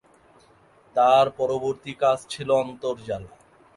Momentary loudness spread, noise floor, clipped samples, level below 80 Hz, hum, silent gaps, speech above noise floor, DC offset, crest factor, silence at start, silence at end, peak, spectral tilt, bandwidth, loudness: 13 LU; -56 dBFS; under 0.1%; -60 dBFS; none; none; 34 dB; under 0.1%; 18 dB; 0.95 s; 0.5 s; -6 dBFS; -5 dB/octave; 11.5 kHz; -23 LUFS